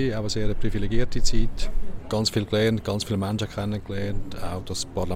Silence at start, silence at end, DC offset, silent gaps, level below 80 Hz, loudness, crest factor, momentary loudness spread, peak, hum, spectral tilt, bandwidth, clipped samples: 0 s; 0 s; under 0.1%; none; -28 dBFS; -27 LUFS; 14 dB; 10 LU; -8 dBFS; none; -5 dB/octave; 12.5 kHz; under 0.1%